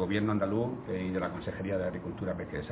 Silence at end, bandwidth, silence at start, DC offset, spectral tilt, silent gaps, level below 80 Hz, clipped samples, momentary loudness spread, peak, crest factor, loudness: 0 s; 4 kHz; 0 s; under 0.1%; -6.5 dB/octave; none; -52 dBFS; under 0.1%; 7 LU; -18 dBFS; 16 dB; -33 LUFS